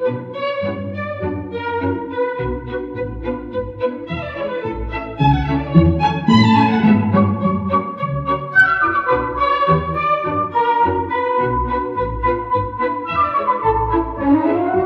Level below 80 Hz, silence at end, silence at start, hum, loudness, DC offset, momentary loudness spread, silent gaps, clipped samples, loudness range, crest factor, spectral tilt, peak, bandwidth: -34 dBFS; 0 s; 0 s; none; -18 LUFS; under 0.1%; 11 LU; none; under 0.1%; 8 LU; 18 dB; -8 dB/octave; 0 dBFS; 7.6 kHz